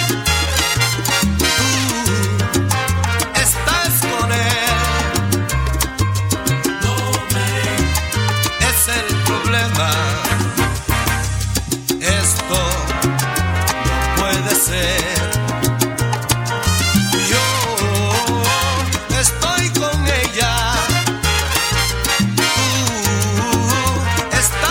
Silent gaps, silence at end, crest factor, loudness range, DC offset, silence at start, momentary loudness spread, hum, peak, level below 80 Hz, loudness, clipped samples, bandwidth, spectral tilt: none; 0 s; 16 dB; 2 LU; under 0.1%; 0 s; 4 LU; none; 0 dBFS; -28 dBFS; -16 LUFS; under 0.1%; 18 kHz; -3.5 dB/octave